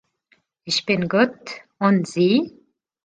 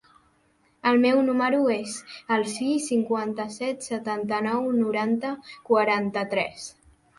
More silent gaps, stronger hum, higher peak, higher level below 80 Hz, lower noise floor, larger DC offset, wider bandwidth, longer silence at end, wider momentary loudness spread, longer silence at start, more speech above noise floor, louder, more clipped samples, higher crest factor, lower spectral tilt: neither; neither; first, -4 dBFS vs -8 dBFS; about the same, -64 dBFS vs -68 dBFS; about the same, -64 dBFS vs -65 dBFS; neither; second, 9.4 kHz vs 11.5 kHz; about the same, 0.55 s vs 0.45 s; first, 17 LU vs 11 LU; second, 0.65 s vs 0.85 s; first, 44 dB vs 40 dB; first, -20 LUFS vs -25 LUFS; neither; about the same, 18 dB vs 16 dB; about the same, -5.5 dB/octave vs -4.5 dB/octave